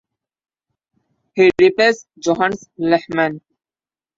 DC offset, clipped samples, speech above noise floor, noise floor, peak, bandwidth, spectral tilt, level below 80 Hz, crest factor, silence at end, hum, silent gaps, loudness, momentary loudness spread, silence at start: under 0.1%; under 0.1%; over 74 dB; under -90 dBFS; -2 dBFS; 7.6 kHz; -5 dB/octave; -56 dBFS; 18 dB; 0.8 s; none; none; -16 LUFS; 11 LU; 1.35 s